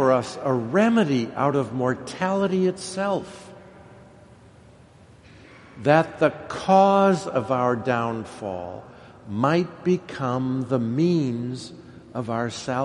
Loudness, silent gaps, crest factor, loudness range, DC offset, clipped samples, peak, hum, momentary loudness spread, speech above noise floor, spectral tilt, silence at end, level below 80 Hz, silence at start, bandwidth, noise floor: -23 LUFS; none; 22 dB; 7 LU; under 0.1%; under 0.1%; -2 dBFS; none; 13 LU; 28 dB; -6.5 dB/octave; 0 s; -60 dBFS; 0 s; 11.5 kHz; -50 dBFS